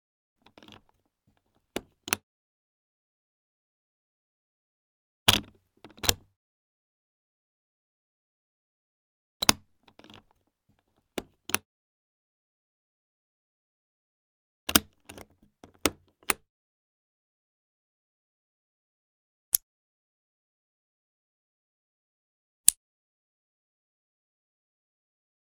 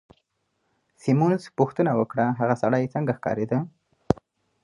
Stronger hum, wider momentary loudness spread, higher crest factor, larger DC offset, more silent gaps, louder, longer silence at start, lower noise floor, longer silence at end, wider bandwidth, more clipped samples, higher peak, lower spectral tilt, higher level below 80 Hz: neither; first, 18 LU vs 6 LU; first, 36 dB vs 24 dB; neither; first, 2.23-5.26 s, 6.36-9.40 s, 11.65-14.67 s, 16.49-19.52 s, 19.63-22.64 s vs none; about the same, -27 LUFS vs -25 LUFS; first, 1.75 s vs 1.05 s; about the same, -72 dBFS vs -74 dBFS; first, 2.7 s vs 0.5 s; first, 19 kHz vs 11 kHz; neither; about the same, 0 dBFS vs -2 dBFS; second, -1 dB/octave vs -8.5 dB/octave; about the same, -58 dBFS vs -56 dBFS